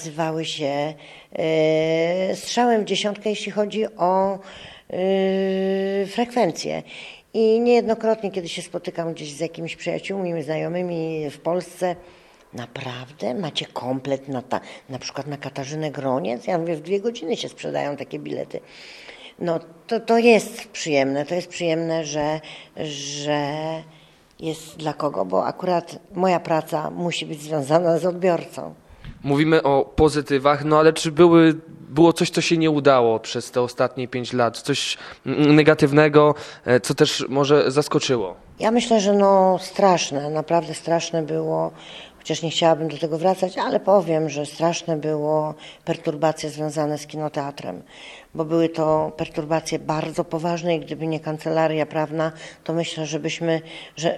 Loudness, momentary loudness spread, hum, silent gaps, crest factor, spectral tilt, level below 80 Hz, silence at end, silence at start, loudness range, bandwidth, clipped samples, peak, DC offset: -22 LUFS; 14 LU; none; none; 20 dB; -5.5 dB/octave; -52 dBFS; 0 s; 0 s; 10 LU; 13.5 kHz; under 0.1%; 0 dBFS; under 0.1%